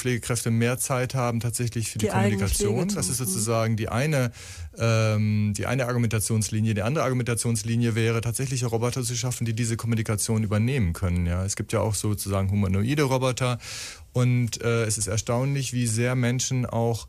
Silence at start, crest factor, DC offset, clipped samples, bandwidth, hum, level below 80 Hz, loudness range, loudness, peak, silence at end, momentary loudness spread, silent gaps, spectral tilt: 0 s; 14 dB; under 0.1%; under 0.1%; 15.5 kHz; none; -46 dBFS; 1 LU; -25 LUFS; -10 dBFS; 0 s; 4 LU; none; -5 dB/octave